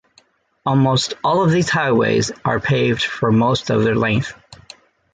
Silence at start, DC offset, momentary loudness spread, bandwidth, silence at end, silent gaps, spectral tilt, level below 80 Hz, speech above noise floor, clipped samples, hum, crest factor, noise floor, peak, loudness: 0.65 s; under 0.1%; 5 LU; 9.4 kHz; 0.6 s; none; -5.5 dB/octave; -48 dBFS; 39 dB; under 0.1%; none; 14 dB; -56 dBFS; -4 dBFS; -17 LUFS